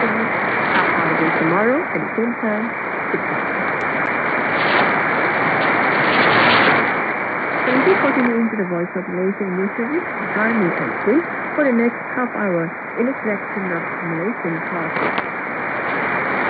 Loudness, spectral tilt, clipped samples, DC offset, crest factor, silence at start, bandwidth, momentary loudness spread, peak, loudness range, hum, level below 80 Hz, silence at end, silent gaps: -18 LUFS; -8.5 dB/octave; under 0.1%; under 0.1%; 18 dB; 0 s; 5 kHz; 8 LU; -2 dBFS; 6 LU; none; -60 dBFS; 0 s; none